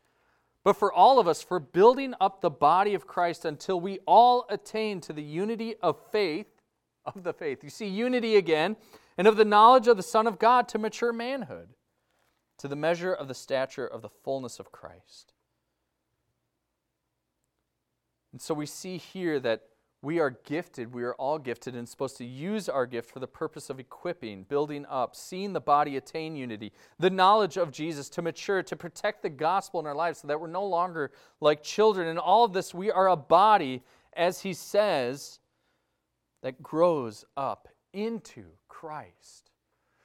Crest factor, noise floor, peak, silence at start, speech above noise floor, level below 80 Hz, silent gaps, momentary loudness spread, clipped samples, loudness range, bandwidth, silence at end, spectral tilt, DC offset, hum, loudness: 22 dB; -81 dBFS; -6 dBFS; 0.65 s; 55 dB; -72 dBFS; none; 18 LU; under 0.1%; 12 LU; 16 kHz; 1 s; -5 dB/octave; under 0.1%; none; -27 LUFS